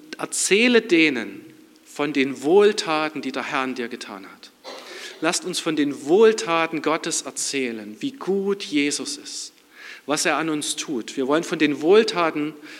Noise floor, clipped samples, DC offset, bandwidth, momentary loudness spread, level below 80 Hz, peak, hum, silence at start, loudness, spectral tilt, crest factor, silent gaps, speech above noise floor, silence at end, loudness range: -47 dBFS; under 0.1%; under 0.1%; 16 kHz; 19 LU; -82 dBFS; -2 dBFS; none; 0 s; -21 LUFS; -3 dB/octave; 20 dB; none; 26 dB; 0 s; 5 LU